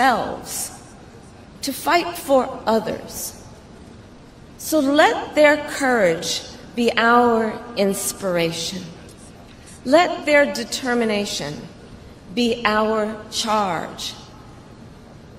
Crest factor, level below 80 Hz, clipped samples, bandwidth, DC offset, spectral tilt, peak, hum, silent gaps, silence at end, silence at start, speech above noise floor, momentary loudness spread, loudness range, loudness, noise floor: 20 dB; -50 dBFS; under 0.1%; 16 kHz; under 0.1%; -3.5 dB/octave; 0 dBFS; none; none; 0 s; 0 s; 24 dB; 15 LU; 5 LU; -20 LUFS; -43 dBFS